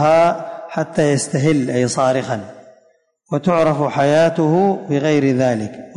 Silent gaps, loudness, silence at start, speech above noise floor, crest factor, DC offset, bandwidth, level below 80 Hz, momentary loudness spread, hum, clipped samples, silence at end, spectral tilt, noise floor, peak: none; -17 LUFS; 0 s; 42 dB; 12 dB; under 0.1%; 11 kHz; -56 dBFS; 11 LU; none; under 0.1%; 0.05 s; -6 dB/octave; -58 dBFS; -4 dBFS